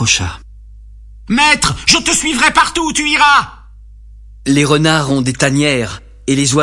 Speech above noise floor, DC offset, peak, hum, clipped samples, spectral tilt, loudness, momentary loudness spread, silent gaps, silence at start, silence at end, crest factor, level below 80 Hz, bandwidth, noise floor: 24 dB; under 0.1%; 0 dBFS; 50 Hz at -50 dBFS; under 0.1%; -3 dB/octave; -12 LUFS; 9 LU; none; 0 s; 0 s; 14 dB; -36 dBFS; 12 kHz; -37 dBFS